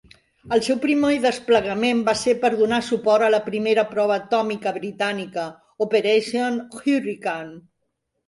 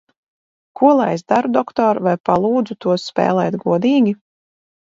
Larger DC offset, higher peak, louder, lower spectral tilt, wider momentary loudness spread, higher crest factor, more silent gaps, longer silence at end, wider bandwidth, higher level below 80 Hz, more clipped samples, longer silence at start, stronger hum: neither; second, -4 dBFS vs 0 dBFS; second, -21 LUFS vs -17 LUFS; second, -4.5 dB/octave vs -7 dB/octave; first, 9 LU vs 5 LU; about the same, 16 dB vs 16 dB; second, none vs 2.20-2.24 s; about the same, 0.7 s vs 0.75 s; first, 11.5 kHz vs 7.8 kHz; about the same, -60 dBFS vs -60 dBFS; neither; second, 0.45 s vs 0.75 s; neither